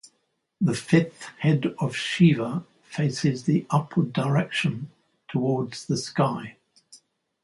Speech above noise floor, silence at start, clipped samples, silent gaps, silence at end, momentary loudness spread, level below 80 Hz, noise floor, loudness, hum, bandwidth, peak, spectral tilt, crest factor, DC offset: 50 dB; 0.6 s; under 0.1%; none; 0.5 s; 13 LU; -64 dBFS; -73 dBFS; -25 LUFS; none; 11.5 kHz; -6 dBFS; -6.5 dB/octave; 20 dB; under 0.1%